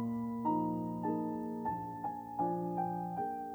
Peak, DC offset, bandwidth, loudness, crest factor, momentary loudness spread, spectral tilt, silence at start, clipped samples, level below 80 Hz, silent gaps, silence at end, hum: -22 dBFS; under 0.1%; over 20 kHz; -37 LUFS; 16 dB; 5 LU; -10 dB/octave; 0 s; under 0.1%; -68 dBFS; none; 0 s; none